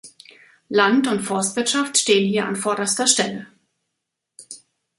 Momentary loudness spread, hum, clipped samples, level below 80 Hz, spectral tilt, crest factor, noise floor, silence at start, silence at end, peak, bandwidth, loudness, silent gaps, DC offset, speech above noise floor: 21 LU; none; under 0.1%; -68 dBFS; -2.5 dB/octave; 20 dB; -80 dBFS; 0.05 s; 0.45 s; -2 dBFS; 11.5 kHz; -19 LUFS; none; under 0.1%; 60 dB